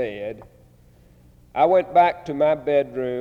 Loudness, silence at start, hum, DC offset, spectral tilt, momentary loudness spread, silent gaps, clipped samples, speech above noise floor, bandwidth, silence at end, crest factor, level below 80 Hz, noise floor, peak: -20 LUFS; 0 s; none; under 0.1%; -7 dB/octave; 16 LU; none; under 0.1%; 32 dB; 6.8 kHz; 0 s; 16 dB; -56 dBFS; -52 dBFS; -6 dBFS